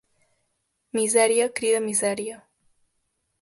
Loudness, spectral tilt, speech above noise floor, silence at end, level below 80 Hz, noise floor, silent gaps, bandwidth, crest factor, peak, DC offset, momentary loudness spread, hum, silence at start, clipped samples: -22 LUFS; -2 dB/octave; 52 dB; 1.05 s; -72 dBFS; -75 dBFS; none; 12 kHz; 20 dB; -6 dBFS; under 0.1%; 12 LU; none; 0.95 s; under 0.1%